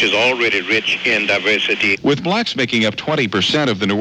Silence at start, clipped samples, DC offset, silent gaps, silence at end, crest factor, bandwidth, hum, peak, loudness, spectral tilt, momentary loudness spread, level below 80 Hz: 0 s; under 0.1%; under 0.1%; none; 0 s; 14 dB; 11.5 kHz; none; -2 dBFS; -15 LUFS; -4 dB/octave; 3 LU; -56 dBFS